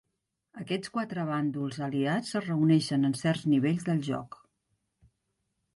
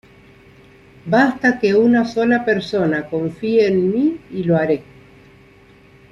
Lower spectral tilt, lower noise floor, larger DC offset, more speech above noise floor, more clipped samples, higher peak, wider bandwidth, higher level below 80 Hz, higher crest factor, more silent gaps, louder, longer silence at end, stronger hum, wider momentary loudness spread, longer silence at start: about the same, -6.5 dB/octave vs -7.5 dB/octave; first, -81 dBFS vs -47 dBFS; neither; first, 53 dB vs 31 dB; neither; second, -14 dBFS vs -2 dBFS; first, 11.5 kHz vs 7.4 kHz; second, -70 dBFS vs -54 dBFS; about the same, 16 dB vs 16 dB; neither; second, -29 LUFS vs -17 LUFS; first, 1.5 s vs 1.3 s; neither; about the same, 10 LU vs 8 LU; second, 0.55 s vs 1.05 s